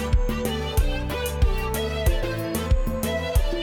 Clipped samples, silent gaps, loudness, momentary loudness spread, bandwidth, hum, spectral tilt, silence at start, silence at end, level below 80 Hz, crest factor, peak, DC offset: under 0.1%; none; -25 LUFS; 3 LU; 18.5 kHz; none; -5.5 dB/octave; 0 s; 0 s; -24 dBFS; 14 dB; -8 dBFS; under 0.1%